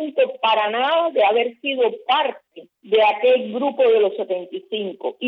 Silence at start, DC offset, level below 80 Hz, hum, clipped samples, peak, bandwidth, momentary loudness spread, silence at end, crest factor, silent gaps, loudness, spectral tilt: 0 s; under 0.1%; -88 dBFS; none; under 0.1%; -6 dBFS; 5.2 kHz; 10 LU; 0 s; 14 dB; none; -19 LUFS; -6 dB/octave